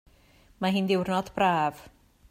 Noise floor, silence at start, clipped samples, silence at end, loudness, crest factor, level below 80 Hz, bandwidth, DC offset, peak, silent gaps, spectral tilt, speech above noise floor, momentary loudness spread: -59 dBFS; 0.6 s; under 0.1%; 0.4 s; -27 LUFS; 18 dB; -60 dBFS; 15.5 kHz; under 0.1%; -12 dBFS; none; -6 dB/octave; 33 dB; 6 LU